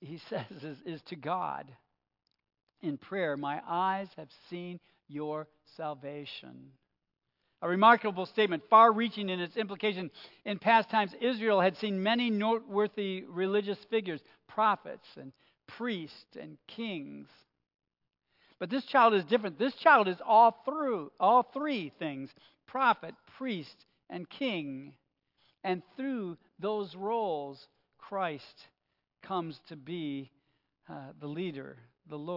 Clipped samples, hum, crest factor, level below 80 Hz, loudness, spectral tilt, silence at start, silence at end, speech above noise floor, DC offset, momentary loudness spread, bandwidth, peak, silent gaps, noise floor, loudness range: under 0.1%; none; 24 dB; -86 dBFS; -30 LUFS; -7.5 dB/octave; 0 s; 0 s; 45 dB; under 0.1%; 21 LU; 5.8 kHz; -8 dBFS; none; -76 dBFS; 14 LU